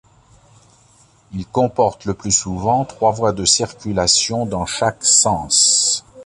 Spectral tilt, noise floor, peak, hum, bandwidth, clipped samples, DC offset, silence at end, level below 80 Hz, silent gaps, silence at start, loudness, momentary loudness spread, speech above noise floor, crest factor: -2.5 dB/octave; -52 dBFS; 0 dBFS; none; 11.5 kHz; under 0.1%; under 0.1%; 0 s; -44 dBFS; none; 1.3 s; -16 LUFS; 10 LU; 35 dB; 18 dB